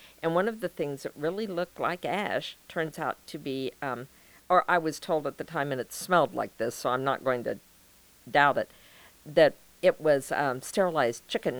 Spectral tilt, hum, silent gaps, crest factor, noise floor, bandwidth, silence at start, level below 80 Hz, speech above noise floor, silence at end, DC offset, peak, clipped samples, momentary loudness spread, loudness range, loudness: -4.5 dB/octave; none; none; 22 dB; -58 dBFS; over 20 kHz; 0.2 s; -68 dBFS; 30 dB; 0 s; under 0.1%; -8 dBFS; under 0.1%; 11 LU; 6 LU; -29 LUFS